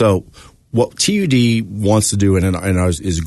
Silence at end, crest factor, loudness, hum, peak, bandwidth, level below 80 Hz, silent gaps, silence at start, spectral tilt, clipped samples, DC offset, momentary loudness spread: 0 s; 14 dB; -16 LUFS; none; -2 dBFS; 12.5 kHz; -36 dBFS; none; 0 s; -5 dB/octave; under 0.1%; under 0.1%; 5 LU